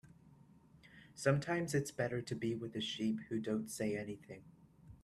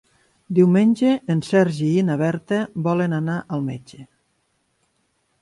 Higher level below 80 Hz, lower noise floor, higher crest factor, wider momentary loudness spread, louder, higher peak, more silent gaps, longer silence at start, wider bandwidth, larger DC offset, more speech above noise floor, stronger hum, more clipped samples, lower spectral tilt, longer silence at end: second, -70 dBFS vs -62 dBFS; second, -64 dBFS vs -68 dBFS; first, 22 dB vs 16 dB; first, 17 LU vs 10 LU; second, -39 LUFS vs -20 LUFS; second, -18 dBFS vs -4 dBFS; neither; second, 0.05 s vs 0.5 s; first, 13.5 kHz vs 11.5 kHz; neither; second, 25 dB vs 49 dB; neither; neither; second, -5.5 dB/octave vs -8 dB/octave; second, 0.1 s vs 1.4 s